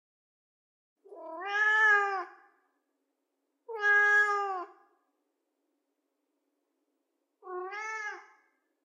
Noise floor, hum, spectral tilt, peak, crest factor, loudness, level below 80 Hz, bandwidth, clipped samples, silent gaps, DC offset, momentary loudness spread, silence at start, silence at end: -82 dBFS; none; 2 dB/octave; -14 dBFS; 18 dB; -26 LUFS; under -90 dBFS; 9.8 kHz; under 0.1%; none; under 0.1%; 23 LU; 1.1 s; 0.65 s